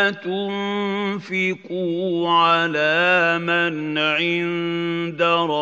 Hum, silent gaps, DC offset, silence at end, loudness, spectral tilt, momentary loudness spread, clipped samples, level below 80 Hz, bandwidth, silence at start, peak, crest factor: none; none; under 0.1%; 0 s; -20 LUFS; -5.5 dB/octave; 9 LU; under 0.1%; -76 dBFS; 7.8 kHz; 0 s; -4 dBFS; 16 dB